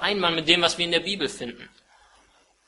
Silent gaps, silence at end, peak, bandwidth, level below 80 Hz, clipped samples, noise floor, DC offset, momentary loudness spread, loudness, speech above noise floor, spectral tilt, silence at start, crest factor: none; 1 s; -2 dBFS; 11.5 kHz; -58 dBFS; under 0.1%; -61 dBFS; under 0.1%; 14 LU; -22 LUFS; 36 dB; -3 dB/octave; 0 s; 24 dB